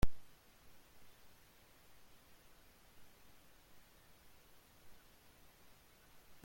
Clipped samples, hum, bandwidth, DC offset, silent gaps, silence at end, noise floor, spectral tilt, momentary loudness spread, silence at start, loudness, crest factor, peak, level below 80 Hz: under 0.1%; none; 16.5 kHz; under 0.1%; none; 0.8 s; -65 dBFS; -5.5 dB/octave; 1 LU; 0 s; -61 LUFS; 24 dB; -18 dBFS; -54 dBFS